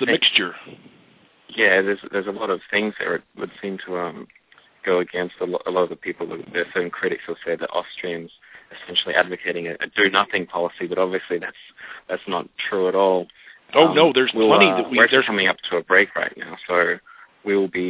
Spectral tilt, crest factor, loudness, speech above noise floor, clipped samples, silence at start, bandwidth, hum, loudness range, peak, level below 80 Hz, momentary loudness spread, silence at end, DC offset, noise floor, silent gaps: -7.5 dB/octave; 22 dB; -20 LUFS; 34 dB; under 0.1%; 0 s; 4 kHz; none; 9 LU; 0 dBFS; -66 dBFS; 15 LU; 0 s; under 0.1%; -55 dBFS; none